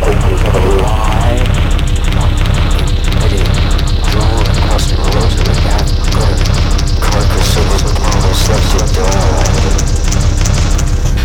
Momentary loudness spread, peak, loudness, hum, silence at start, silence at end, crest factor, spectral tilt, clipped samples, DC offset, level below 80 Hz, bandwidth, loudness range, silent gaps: 2 LU; 0 dBFS; -12 LUFS; none; 0 s; 0 s; 8 dB; -5 dB/octave; under 0.1%; under 0.1%; -12 dBFS; 16 kHz; 1 LU; none